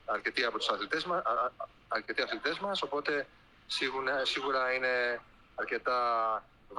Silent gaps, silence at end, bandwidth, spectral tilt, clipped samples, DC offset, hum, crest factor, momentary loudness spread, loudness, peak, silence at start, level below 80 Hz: none; 0 s; 12.5 kHz; -2.5 dB/octave; under 0.1%; under 0.1%; none; 20 dB; 8 LU; -32 LUFS; -14 dBFS; 0.05 s; -66 dBFS